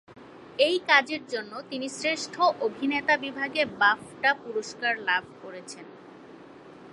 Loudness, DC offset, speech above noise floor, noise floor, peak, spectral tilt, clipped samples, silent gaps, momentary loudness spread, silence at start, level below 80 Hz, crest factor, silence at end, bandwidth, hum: -26 LUFS; under 0.1%; 21 dB; -48 dBFS; -6 dBFS; -2.5 dB/octave; under 0.1%; none; 19 LU; 0.1 s; -72 dBFS; 22 dB; 0 s; 11.5 kHz; none